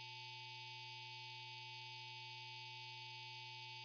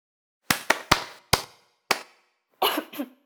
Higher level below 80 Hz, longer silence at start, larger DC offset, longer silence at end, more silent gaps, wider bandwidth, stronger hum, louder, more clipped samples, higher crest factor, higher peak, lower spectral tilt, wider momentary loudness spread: second, under -90 dBFS vs -50 dBFS; second, 0 s vs 0.5 s; neither; second, 0 s vs 0.2 s; neither; second, 5.4 kHz vs over 20 kHz; first, 60 Hz at -65 dBFS vs none; second, -51 LUFS vs -25 LUFS; neither; second, 12 dB vs 28 dB; second, -40 dBFS vs 0 dBFS; second, 0 dB/octave vs -2 dB/octave; second, 0 LU vs 8 LU